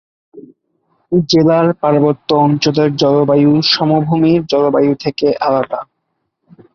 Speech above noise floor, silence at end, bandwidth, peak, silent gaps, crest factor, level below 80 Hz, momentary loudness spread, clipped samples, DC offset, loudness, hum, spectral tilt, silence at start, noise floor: 58 dB; 0.9 s; 7 kHz; 0 dBFS; none; 12 dB; -52 dBFS; 5 LU; under 0.1%; under 0.1%; -13 LUFS; none; -6.5 dB/octave; 0.35 s; -70 dBFS